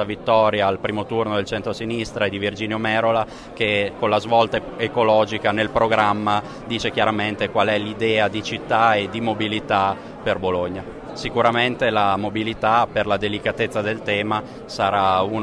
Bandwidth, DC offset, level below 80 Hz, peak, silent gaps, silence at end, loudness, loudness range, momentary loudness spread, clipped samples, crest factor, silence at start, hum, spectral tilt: 11 kHz; under 0.1%; -48 dBFS; -4 dBFS; none; 0 s; -21 LUFS; 2 LU; 8 LU; under 0.1%; 18 dB; 0 s; none; -5.5 dB/octave